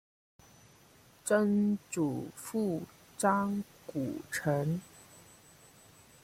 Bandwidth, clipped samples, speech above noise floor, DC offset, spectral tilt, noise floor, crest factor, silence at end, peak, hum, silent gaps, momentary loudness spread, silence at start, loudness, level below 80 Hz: 16 kHz; under 0.1%; 29 dB; under 0.1%; -6 dB/octave; -61 dBFS; 20 dB; 1.05 s; -14 dBFS; none; none; 13 LU; 1.25 s; -33 LUFS; -70 dBFS